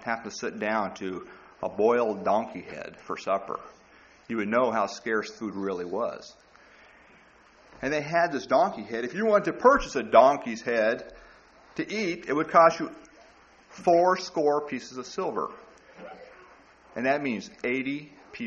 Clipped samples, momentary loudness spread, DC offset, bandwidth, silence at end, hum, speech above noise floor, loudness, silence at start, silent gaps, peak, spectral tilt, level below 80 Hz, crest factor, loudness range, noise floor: under 0.1%; 17 LU; under 0.1%; 7.8 kHz; 0 s; none; 30 dB; -26 LUFS; 0 s; none; -6 dBFS; -3.5 dB/octave; -58 dBFS; 22 dB; 8 LU; -56 dBFS